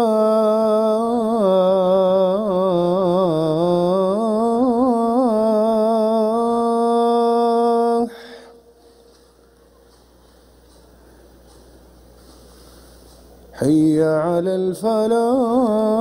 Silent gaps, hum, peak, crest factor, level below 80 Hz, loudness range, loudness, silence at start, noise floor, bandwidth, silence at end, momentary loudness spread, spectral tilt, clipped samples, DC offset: none; none; -6 dBFS; 12 dB; -54 dBFS; 6 LU; -17 LUFS; 0 s; -51 dBFS; 16 kHz; 0 s; 4 LU; -7.5 dB/octave; under 0.1%; under 0.1%